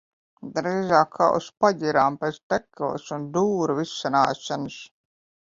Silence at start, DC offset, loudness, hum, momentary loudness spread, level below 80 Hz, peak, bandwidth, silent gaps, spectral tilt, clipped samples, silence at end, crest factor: 0.45 s; under 0.1%; -24 LUFS; none; 11 LU; -64 dBFS; -4 dBFS; 7.8 kHz; 2.43-2.50 s; -5.5 dB/octave; under 0.1%; 0.65 s; 22 dB